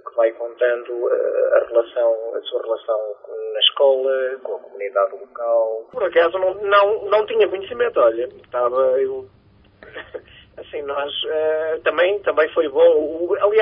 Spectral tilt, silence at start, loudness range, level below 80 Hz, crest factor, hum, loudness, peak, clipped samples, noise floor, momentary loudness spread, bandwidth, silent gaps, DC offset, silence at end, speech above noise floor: -7.5 dB/octave; 0.05 s; 5 LU; -62 dBFS; 16 dB; none; -19 LUFS; -2 dBFS; under 0.1%; -48 dBFS; 13 LU; 5.2 kHz; none; under 0.1%; 0 s; 29 dB